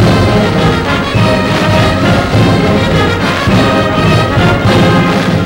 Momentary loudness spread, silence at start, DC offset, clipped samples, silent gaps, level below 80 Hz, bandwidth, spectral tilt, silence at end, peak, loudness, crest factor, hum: 2 LU; 0 s; under 0.1%; under 0.1%; none; -24 dBFS; 16.5 kHz; -6 dB/octave; 0 s; -2 dBFS; -9 LUFS; 6 dB; none